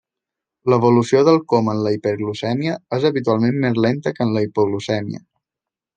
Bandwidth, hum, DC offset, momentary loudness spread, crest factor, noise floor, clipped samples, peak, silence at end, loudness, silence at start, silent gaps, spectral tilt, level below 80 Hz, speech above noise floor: 9.2 kHz; none; under 0.1%; 9 LU; 16 dB; -87 dBFS; under 0.1%; -2 dBFS; 0.75 s; -18 LUFS; 0.65 s; none; -7 dB/octave; -62 dBFS; 69 dB